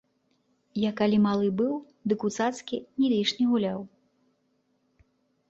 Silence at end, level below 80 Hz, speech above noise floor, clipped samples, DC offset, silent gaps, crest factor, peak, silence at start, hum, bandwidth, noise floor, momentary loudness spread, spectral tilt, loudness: 1.6 s; -68 dBFS; 46 dB; under 0.1%; under 0.1%; none; 16 dB; -12 dBFS; 0.75 s; none; 8 kHz; -72 dBFS; 12 LU; -6 dB/octave; -27 LUFS